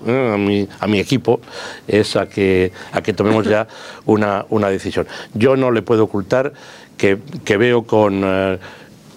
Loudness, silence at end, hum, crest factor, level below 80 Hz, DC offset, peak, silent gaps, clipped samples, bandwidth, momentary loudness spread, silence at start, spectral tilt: -17 LUFS; 0.35 s; none; 16 dB; -56 dBFS; under 0.1%; 0 dBFS; none; under 0.1%; 15 kHz; 10 LU; 0 s; -6.5 dB/octave